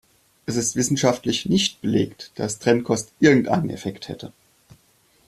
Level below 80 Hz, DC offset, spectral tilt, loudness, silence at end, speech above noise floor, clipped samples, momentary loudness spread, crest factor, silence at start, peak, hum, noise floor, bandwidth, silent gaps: -56 dBFS; under 0.1%; -4.5 dB/octave; -21 LUFS; 1 s; 39 dB; under 0.1%; 17 LU; 20 dB; 0.5 s; -2 dBFS; none; -60 dBFS; 14.5 kHz; none